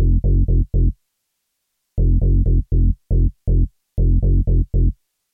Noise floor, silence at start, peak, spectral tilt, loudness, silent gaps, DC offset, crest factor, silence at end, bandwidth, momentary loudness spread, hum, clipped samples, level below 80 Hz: -74 dBFS; 0 s; -6 dBFS; -14 dB/octave; -20 LUFS; none; under 0.1%; 10 dB; 0.4 s; 0.8 kHz; 6 LU; none; under 0.1%; -18 dBFS